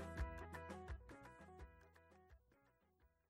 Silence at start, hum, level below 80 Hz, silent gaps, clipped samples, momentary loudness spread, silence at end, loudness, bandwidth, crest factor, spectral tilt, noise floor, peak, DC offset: 0 s; none; -58 dBFS; none; under 0.1%; 19 LU; 0.2 s; -55 LUFS; 15.5 kHz; 20 dB; -6.5 dB/octave; -78 dBFS; -34 dBFS; under 0.1%